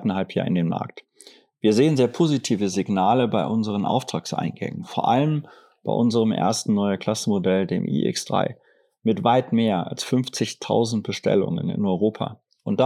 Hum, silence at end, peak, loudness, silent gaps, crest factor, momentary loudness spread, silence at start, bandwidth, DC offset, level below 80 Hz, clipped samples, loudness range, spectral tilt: none; 0 s; -4 dBFS; -23 LUFS; none; 18 dB; 8 LU; 0 s; 13.5 kHz; under 0.1%; -74 dBFS; under 0.1%; 2 LU; -6 dB/octave